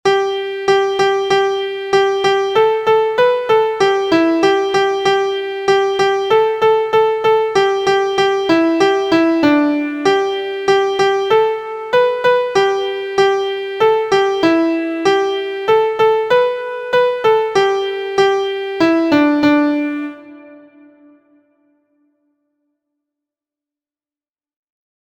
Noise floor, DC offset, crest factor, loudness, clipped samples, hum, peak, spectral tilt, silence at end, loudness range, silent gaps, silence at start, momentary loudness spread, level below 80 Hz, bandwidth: under -90 dBFS; under 0.1%; 14 dB; -15 LUFS; under 0.1%; none; 0 dBFS; -4.5 dB/octave; 4.5 s; 2 LU; none; 0.05 s; 6 LU; -56 dBFS; 9.8 kHz